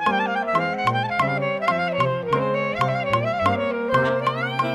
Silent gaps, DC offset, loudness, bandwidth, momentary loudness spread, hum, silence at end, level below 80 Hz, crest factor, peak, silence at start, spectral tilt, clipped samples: none; under 0.1%; -22 LUFS; 14.5 kHz; 2 LU; none; 0 s; -54 dBFS; 16 dB; -6 dBFS; 0 s; -6.5 dB/octave; under 0.1%